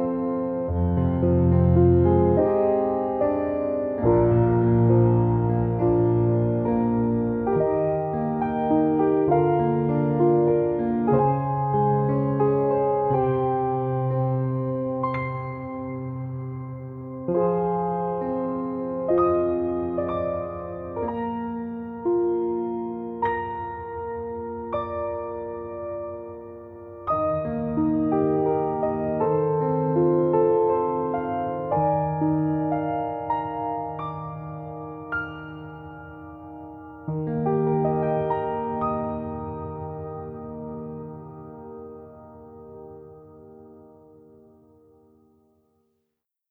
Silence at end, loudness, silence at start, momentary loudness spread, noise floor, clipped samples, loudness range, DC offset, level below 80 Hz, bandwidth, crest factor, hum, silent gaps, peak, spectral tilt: 2.65 s; -24 LUFS; 0 s; 16 LU; -80 dBFS; under 0.1%; 11 LU; under 0.1%; -44 dBFS; 4 kHz; 18 dB; none; none; -6 dBFS; -12.5 dB/octave